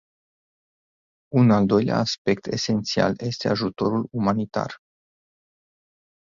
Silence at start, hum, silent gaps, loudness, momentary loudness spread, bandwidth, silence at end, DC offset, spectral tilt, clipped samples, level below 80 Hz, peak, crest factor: 1.3 s; none; 2.18-2.25 s; -23 LUFS; 8 LU; 7.6 kHz; 1.45 s; under 0.1%; -6 dB/octave; under 0.1%; -56 dBFS; -4 dBFS; 20 dB